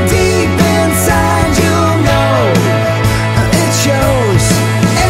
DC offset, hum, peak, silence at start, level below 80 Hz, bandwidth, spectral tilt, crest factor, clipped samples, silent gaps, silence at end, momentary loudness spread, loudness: under 0.1%; none; 0 dBFS; 0 s; -24 dBFS; 16.5 kHz; -5 dB/octave; 10 dB; under 0.1%; none; 0 s; 2 LU; -11 LUFS